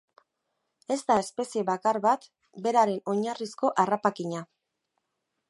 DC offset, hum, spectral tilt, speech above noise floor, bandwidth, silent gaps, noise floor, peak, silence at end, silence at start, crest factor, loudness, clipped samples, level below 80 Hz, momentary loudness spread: under 0.1%; none; -5 dB/octave; 55 dB; 11.5 kHz; none; -81 dBFS; -8 dBFS; 1.05 s; 0.9 s; 20 dB; -27 LUFS; under 0.1%; -76 dBFS; 9 LU